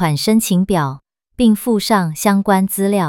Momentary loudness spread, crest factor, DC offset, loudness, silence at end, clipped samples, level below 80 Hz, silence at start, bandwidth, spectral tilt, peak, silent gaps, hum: 4 LU; 14 dB; under 0.1%; -15 LUFS; 0 s; under 0.1%; -44 dBFS; 0 s; 17 kHz; -5.5 dB/octave; -2 dBFS; none; none